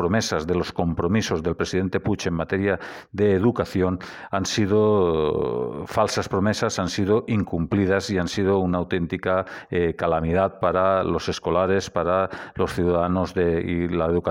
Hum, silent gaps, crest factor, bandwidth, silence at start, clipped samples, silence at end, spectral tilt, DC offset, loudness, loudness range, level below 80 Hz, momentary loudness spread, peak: none; none; 16 dB; 16 kHz; 0 s; under 0.1%; 0 s; -6 dB/octave; under 0.1%; -23 LUFS; 1 LU; -44 dBFS; 5 LU; -6 dBFS